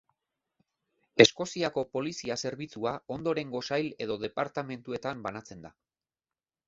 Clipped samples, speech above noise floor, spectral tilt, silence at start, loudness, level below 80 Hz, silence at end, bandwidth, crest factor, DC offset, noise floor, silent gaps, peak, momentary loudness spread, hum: under 0.1%; over 60 dB; -4 dB/octave; 1.15 s; -30 LUFS; -68 dBFS; 1 s; 7.8 kHz; 30 dB; under 0.1%; under -90 dBFS; none; -2 dBFS; 16 LU; none